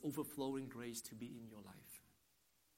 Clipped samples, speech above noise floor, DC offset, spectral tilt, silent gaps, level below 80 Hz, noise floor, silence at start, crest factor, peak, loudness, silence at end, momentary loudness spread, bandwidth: under 0.1%; 30 dB; under 0.1%; -5 dB/octave; none; -80 dBFS; -78 dBFS; 0 s; 18 dB; -30 dBFS; -49 LUFS; 0.7 s; 14 LU; 16 kHz